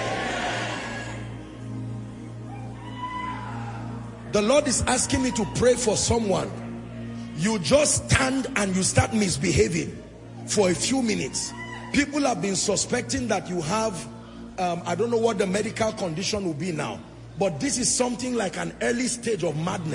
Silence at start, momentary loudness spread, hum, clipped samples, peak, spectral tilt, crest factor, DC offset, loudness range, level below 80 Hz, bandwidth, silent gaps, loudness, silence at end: 0 s; 15 LU; none; under 0.1%; -4 dBFS; -4 dB/octave; 20 dB; under 0.1%; 6 LU; -46 dBFS; 11 kHz; none; -25 LUFS; 0 s